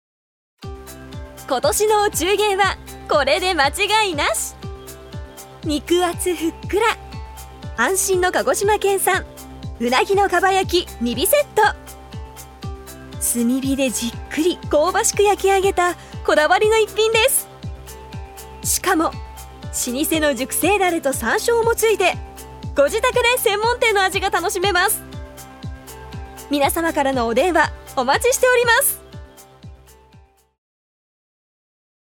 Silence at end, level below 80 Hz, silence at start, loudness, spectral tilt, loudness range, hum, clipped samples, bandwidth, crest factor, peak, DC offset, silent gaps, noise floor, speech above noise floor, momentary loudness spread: 2.35 s; -40 dBFS; 0.6 s; -18 LUFS; -3 dB/octave; 4 LU; none; under 0.1%; 19.5 kHz; 18 dB; -2 dBFS; under 0.1%; none; -51 dBFS; 33 dB; 19 LU